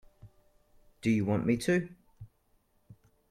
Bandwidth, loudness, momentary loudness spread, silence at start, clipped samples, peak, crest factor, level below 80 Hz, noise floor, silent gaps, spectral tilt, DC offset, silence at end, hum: 14.5 kHz; -30 LUFS; 7 LU; 0.25 s; under 0.1%; -16 dBFS; 18 dB; -62 dBFS; -70 dBFS; none; -6.5 dB/octave; under 0.1%; 0.35 s; none